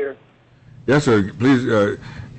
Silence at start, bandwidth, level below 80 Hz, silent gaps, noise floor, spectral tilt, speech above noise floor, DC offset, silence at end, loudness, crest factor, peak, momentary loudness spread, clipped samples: 0 s; 8.6 kHz; -50 dBFS; none; -51 dBFS; -6.5 dB/octave; 34 dB; under 0.1%; 0 s; -18 LUFS; 12 dB; -8 dBFS; 14 LU; under 0.1%